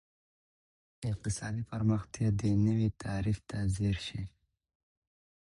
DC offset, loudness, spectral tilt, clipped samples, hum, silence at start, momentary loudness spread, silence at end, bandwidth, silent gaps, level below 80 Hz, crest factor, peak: under 0.1%; -33 LUFS; -6.5 dB/octave; under 0.1%; none; 1 s; 11 LU; 1.15 s; 11.5 kHz; none; -50 dBFS; 18 dB; -16 dBFS